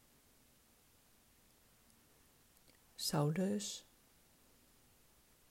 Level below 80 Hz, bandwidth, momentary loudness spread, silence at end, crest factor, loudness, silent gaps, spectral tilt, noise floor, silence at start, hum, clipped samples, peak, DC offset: -76 dBFS; 16 kHz; 14 LU; 1.7 s; 22 dB; -39 LUFS; none; -5 dB/octave; -70 dBFS; 3 s; none; under 0.1%; -24 dBFS; under 0.1%